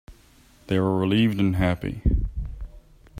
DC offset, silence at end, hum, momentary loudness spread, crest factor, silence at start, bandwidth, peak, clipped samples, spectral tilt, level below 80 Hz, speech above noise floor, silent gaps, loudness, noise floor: under 0.1%; 0 s; none; 17 LU; 16 dB; 0.1 s; 15.5 kHz; -8 dBFS; under 0.1%; -8 dB/octave; -32 dBFS; 33 dB; none; -24 LUFS; -54 dBFS